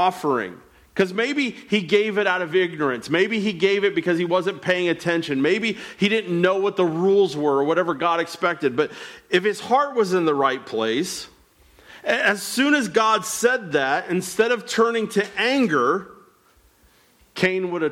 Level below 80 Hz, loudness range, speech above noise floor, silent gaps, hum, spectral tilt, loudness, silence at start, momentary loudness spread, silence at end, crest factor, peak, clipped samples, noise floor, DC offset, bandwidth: -64 dBFS; 2 LU; 36 dB; none; none; -4.5 dB/octave; -21 LUFS; 0 s; 6 LU; 0 s; 16 dB; -6 dBFS; under 0.1%; -57 dBFS; under 0.1%; 16.5 kHz